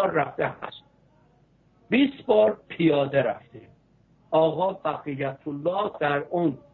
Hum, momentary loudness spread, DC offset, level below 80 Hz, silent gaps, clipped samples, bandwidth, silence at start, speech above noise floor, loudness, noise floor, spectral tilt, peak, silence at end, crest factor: none; 10 LU; under 0.1%; -64 dBFS; none; under 0.1%; 4.3 kHz; 0 s; 36 dB; -25 LUFS; -61 dBFS; -9.5 dB/octave; -8 dBFS; 0.15 s; 16 dB